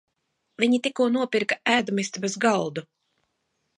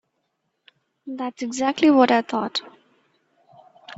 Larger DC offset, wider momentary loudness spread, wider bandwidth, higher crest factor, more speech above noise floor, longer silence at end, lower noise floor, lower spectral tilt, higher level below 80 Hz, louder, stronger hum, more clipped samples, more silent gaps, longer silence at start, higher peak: neither; second, 6 LU vs 16 LU; first, 11 kHz vs 8 kHz; about the same, 20 dB vs 20 dB; about the same, 52 dB vs 54 dB; first, 0.95 s vs 0.05 s; about the same, -76 dBFS vs -74 dBFS; about the same, -4 dB/octave vs -4 dB/octave; about the same, -72 dBFS vs -70 dBFS; second, -24 LUFS vs -21 LUFS; neither; neither; neither; second, 0.6 s vs 1.05 s; about the same, -6 dBFS vs -4 dBFS